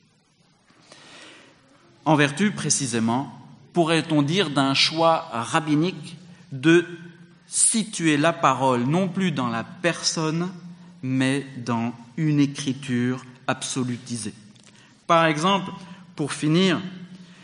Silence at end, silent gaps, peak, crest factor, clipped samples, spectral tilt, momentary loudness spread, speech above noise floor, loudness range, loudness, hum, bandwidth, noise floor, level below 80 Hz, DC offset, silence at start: 0.1 s; none; -2 dBFS; 20 dB; under 0.1%; -4 dB/octave; 16 LU; 39 dB; 4 LU; -22 LUFS; none; 10.5 kHz; -61 dBFS; -70 dBFS; under 0.1%; 1.1 s